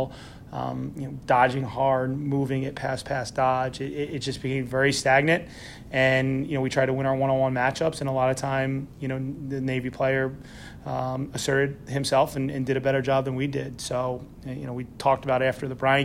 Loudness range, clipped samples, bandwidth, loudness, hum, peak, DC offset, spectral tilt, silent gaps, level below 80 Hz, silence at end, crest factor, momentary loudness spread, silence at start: 4 LU; under 0.1%; 15.5 kHz; -26 LUFS; none; -6 dBFS; under 0.1%; -5.5 dB/octave; none; -52 dBFS; 0 s; 18 dB; 12 LU; 0 s